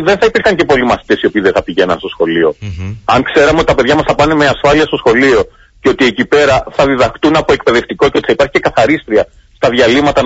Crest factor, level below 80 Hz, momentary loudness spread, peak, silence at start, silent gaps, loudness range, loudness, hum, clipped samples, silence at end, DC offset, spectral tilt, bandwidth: 10 dB; -34 dBFS; 6 LU; 0 dBFS; 0 s; none; 2 LU; -10 LUFS; none; under 0.1%; 0 s; under 0.1%; -5 dB/octave; 8 kHz